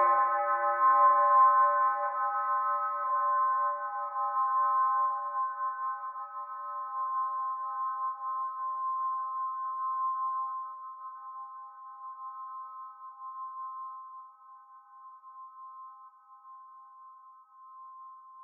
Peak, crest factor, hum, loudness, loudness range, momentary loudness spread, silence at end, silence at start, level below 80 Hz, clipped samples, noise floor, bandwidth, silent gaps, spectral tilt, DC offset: -14 dBFS; 18 dB; none; -29 LUFS; 24 LU; 24 LU; 0 s; 0 s; under -90 dBFS; under 0.1%; -55 dBFS; 2.6 kHz; none; 8.5 dB/octave; under 0.1%